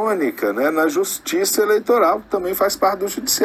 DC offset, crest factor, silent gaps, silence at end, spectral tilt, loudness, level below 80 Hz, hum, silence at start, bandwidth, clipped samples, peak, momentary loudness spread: under 0.1%; 14 dB; none; 0 s; -2.5 dB/octave; -18 LUFS; -56 dBFS; none; 0 s; 17 kHz; under 0.1%; -4 dBFS; 5 LU